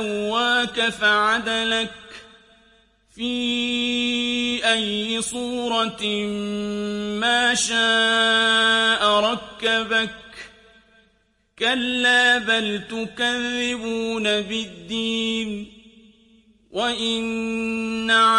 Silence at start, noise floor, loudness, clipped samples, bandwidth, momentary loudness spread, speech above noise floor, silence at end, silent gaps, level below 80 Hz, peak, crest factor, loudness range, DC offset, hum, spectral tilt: 0 s; -64 dBFS; -21 LUFS; under 0.1%; 11.5 kHz; 11 LU; 43 dB; 0 s; none; -56 dBFS; -6 dBFS; 16 dB; 7 LU; under 0.1%; none; -2 dB/octave